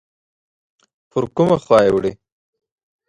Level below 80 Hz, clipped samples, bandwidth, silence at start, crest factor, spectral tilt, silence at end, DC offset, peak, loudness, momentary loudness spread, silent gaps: -52 dBFS; under 0.1%; 11.5 kHz; 1.15 s; 18 dB; -7 dB/octave; 0.95 s; under 0.1%; -2 dBFS; -17 LUFS; 12 LU; none